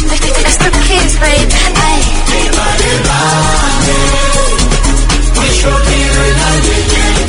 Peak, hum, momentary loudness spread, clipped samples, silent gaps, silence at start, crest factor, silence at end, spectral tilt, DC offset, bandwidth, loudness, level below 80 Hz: 0 dBFS; none; 2 LU; 0.3%; none; 0 s; 8 dB; 0 s; -3 dB/octave; under 0.1%; 11 kHz; -10 LUFS; -12 dBFS